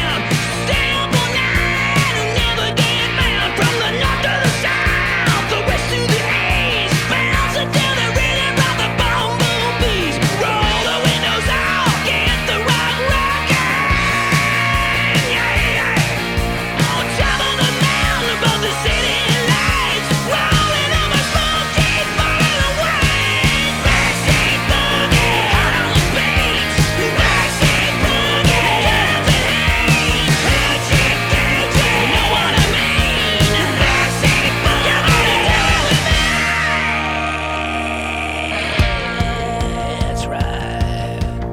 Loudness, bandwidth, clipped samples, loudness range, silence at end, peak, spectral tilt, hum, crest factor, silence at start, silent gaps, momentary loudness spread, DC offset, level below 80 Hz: -15 LUFS; 18 kHz; under 0.1%; 2 LU; 0 s; -4 dBFS; -4 dB/octave; none; 12 dB; 0 s; none; 5 LU; under 0.1%; -26 dBFS